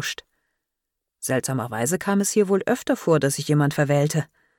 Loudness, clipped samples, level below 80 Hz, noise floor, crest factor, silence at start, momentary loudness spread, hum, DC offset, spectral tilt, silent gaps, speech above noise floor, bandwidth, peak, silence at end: -22 LUFS; under 0.1%; -62 dBFS; -83 dBFS; 14 dB; 0 s; 7 LU; none; under 0.1%; -5 dB/octave; none; 61 dB; 17.5 kHz; -8 dBFS; 0.35 s